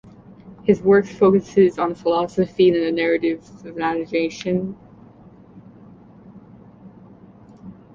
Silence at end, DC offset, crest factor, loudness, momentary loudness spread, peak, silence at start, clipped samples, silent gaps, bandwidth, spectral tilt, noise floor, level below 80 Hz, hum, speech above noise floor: 0.2 s; under 0.1%; 18 dB; -19 LUFS; 10 LU; -2 dBFS; 0.45 s; under 0.1%; none; 7.4 kHz; -7 dB/octave; -46 dBFS; -56 dBFS; none; 28 dB